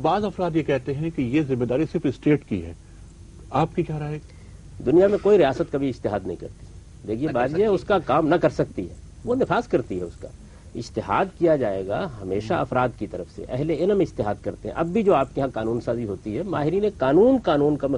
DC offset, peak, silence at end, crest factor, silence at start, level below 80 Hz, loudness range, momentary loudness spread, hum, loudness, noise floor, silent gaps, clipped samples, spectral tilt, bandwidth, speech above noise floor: under 0.1%; -6 dBFS; 0 s; 18 dB; 0 s; -46 dBFS; 3 LU; 14 LU; none; -23 LUFS; -44 dBFS; none; under 0.1%; -8 dB/octave; 10.5 kHz; 21 dB